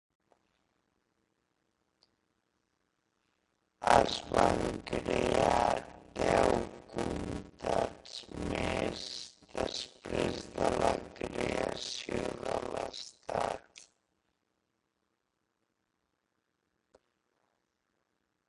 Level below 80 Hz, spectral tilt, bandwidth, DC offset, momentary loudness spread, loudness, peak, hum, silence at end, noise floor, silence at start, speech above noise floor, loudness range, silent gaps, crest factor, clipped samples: -52 dBFS; -4.5 dB/octave; 11.5 kHz; under 0.1%; 13 LU; -33 LUFS; -10 dBFS; none; 4.65 s; -82 dBFS; 3.8 s; 53 dB; 10 LU; none; 26 dB; under 0.1%